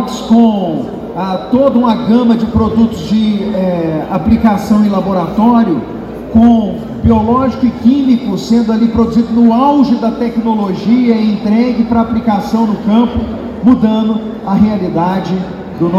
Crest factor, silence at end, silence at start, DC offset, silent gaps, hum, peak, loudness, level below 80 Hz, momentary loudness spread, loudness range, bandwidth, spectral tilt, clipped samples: 10 dB; 0 s; 0 s; under 0.1%; none; none; 0 dBFS; -11 LUFS; -32 dBFS; 8 LU; 2 LU; 7.6 kHz; -8 dB/octave; 0.4%